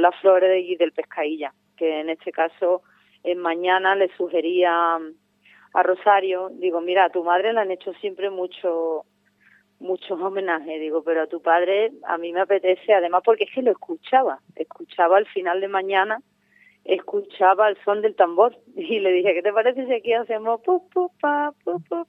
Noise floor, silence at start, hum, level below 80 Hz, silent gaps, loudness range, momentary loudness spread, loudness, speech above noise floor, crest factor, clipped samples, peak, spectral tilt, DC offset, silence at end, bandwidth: -59 dBFS; 0 s; 50 Hz at -70 dBFS; -88 dBFS; none; 4 LU; 10 LU; -22 LUFS; 37 dB; 20 dB; under 0.1%; -2 dBFS; -6.5 dB/octave; under 0.1%; 0.05 s; 4.1 kHz